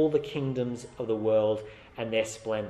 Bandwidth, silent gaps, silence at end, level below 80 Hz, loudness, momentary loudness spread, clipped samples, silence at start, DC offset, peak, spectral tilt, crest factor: 12.5 kHz; none; 0 s; -60 dBFS; -30 LUFS; 10 LU; under 0.1%; 0 s; under 0.1%; -14 dBFS; -6 dB/octave; 16 dB